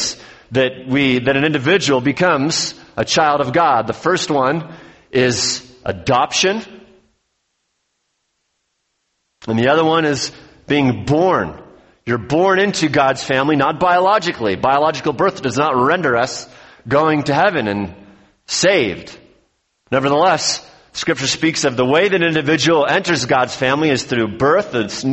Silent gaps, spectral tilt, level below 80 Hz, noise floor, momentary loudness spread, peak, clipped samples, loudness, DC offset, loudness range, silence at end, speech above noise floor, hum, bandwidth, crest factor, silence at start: none; -4 dB/octave; -50 dBFS; -70 dBFS; 9 LU; -2 dBFS; under 0.1%; -16 LUFS; under 0.1%; 5 LU; 0 s; 54 dB; none; 8.4 kHz; 16 dB; 0 s